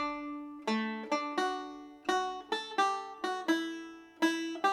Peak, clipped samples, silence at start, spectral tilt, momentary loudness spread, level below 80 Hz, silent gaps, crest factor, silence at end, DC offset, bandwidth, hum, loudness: -16 dBFS; under 0.1%; 0 s; -3 dB/octave; 9 LU; -74 dBFS; none; 18 dB; 0 s; under 0.1%; 15 kHz; none; -34 LUFS